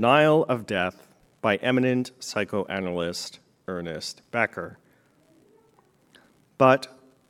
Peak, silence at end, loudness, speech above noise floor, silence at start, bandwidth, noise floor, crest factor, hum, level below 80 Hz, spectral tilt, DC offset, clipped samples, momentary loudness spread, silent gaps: -4 dBFS; 0.4 s; -25 LUFS; 38 dB; 0 s; 15.5 kHz; -62 dBFS; 22 dB; none; -68 dBFS; -5.5 dB/octave; under 0.1%; under 0.1%; 16 LU; none